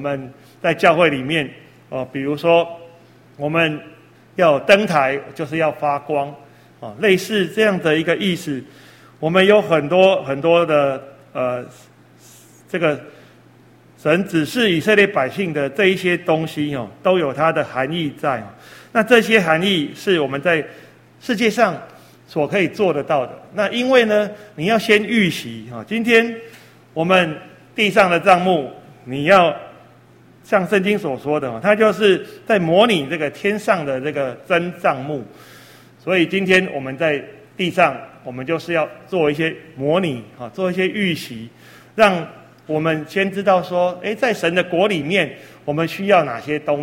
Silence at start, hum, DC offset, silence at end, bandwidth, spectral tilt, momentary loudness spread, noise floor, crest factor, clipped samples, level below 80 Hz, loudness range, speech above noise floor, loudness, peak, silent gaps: 0 s; none; under 0.1%; 0 s; 16.5 kHz; -5.5 dB/octave; 15 LU; -48 dBFS; 18 dB; under 0.1%; -60 dBFS; 4 LU; 31 dB; -18 LUFS; 0 dBFS; none